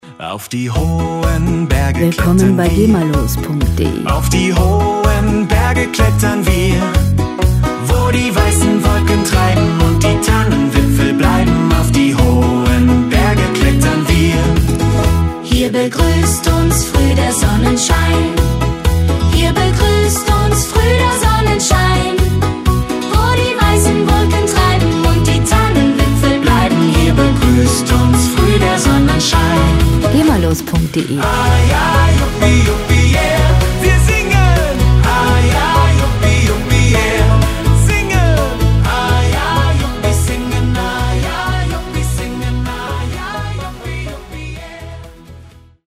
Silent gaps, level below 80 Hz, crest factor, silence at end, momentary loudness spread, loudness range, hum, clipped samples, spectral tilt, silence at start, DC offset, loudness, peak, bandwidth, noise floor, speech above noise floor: none; -18 dBFS; 12 dB; 0.45 s; 6 LU; 3 LU; none; under 0.1%; -5.5 dB/octave; 0.05 s; under 0.1%; -12 LUFS; 0 dBFS; 16 kHz; -39 dBFS; 27 dB